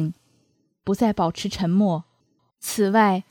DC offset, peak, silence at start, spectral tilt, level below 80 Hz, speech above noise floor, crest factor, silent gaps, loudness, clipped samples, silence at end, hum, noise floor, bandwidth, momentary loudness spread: under 0.1%; -4 dBFS; 0 s; -6 dB/octave; -54 dBFS; 46 dB; 18 dB; none; -22 LUFS; under 0.1%; 0.1 s; none; -67 dBFS; 19 kHz; 12 LU